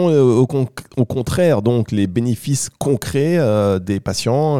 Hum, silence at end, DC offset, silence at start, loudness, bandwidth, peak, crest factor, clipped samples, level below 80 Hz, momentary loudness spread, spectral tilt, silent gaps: none; 0 s; 0.5%; 0 s; -17 LUFS; 16 kHz; -4 dBFS; 12 dB; under 0.1%; -46 dBFS; 7 LU; -6.5 dB/octave; none